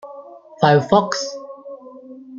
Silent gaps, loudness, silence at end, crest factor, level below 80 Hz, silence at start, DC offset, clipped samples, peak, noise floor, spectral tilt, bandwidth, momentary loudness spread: none; -17 LUFS; 0 s; 18 dB; -60 dBFS; 0.05 s; under 0.1%; under 0.1%; -2 dBFS; -39 dBFS; -5.5 dB/octave; 7.6 kHz; 24 LU